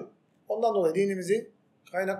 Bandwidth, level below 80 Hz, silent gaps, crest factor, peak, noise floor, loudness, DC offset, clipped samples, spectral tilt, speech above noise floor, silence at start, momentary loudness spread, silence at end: 14 kHz; -88 dBFS; none; 14 dB; -14 dBFS; -48 dBFS; -28 LUFS; under 0.1%; under 0.1%; -6 dB/octave; 21 dB; 0 s; 10 LU; 0 s